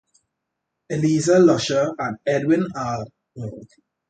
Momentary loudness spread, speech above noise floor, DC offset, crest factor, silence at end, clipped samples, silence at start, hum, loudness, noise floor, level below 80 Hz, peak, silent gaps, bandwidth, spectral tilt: 19 LU; 60 dB; under 0.1%; 16 dB; 0.45 s; under 0.1%; 0.9 s; none; -20 LUFS; -80 dBFS; -58 dBFS; -4 dBFS; none; 9.2 kHz; -5.5 dB/octave